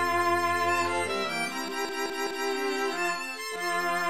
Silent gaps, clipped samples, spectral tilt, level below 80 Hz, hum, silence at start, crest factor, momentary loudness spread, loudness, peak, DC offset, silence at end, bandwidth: none; under 0.1%; -2.5 dB/octave; -62 dBFS; none; 0 s; 14 dB; 6 LU; -28 LUFS; -16 dBFS; 0.4%; 0 s; 15.5 kHz